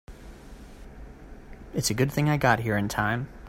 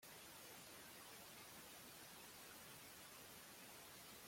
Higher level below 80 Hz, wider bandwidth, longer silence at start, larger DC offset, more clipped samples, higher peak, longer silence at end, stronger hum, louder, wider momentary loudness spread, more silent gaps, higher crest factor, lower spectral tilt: first, -46 dBFS vs -84 dBFS; about the same, 16 kHz vs 16.5 kHz; about the same, 0.1 s vs 0 s; neither; neither; first, -8 dBFS vs -46 dBFS; about the same, 0 s vs 0 s; neither; first, -25 LUFS vs -58 LUFS; first, 24 LU vs 1 LU; neither; first, 20 dB vs 14 dB; first, -5 dB/octave vs -1.5 dB/octave